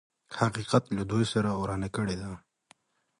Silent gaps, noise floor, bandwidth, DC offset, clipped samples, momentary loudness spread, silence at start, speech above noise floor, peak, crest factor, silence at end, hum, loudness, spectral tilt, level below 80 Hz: none; -64 dBFS; 11.5 kHz; under 0.1%; under 0.1%; 13 LU; 0.3 s; 36 dB; -8 dBFS; 22 dB; 0.8 s; none; -30 LUFS; -6 dB/octave; -54 dBFS